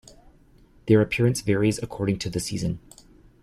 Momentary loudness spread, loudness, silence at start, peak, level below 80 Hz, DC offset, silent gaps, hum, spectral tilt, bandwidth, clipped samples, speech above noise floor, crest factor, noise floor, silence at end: 10 LU; -24 LUFS; 0.85 s; -6 dBFS; -48 dBFS; under 0.1%; none; none; -6 dB/octave; 14.5 kHz; under 0.1%; 32 dB; 20 dB; -55 dBFS; 0.65 s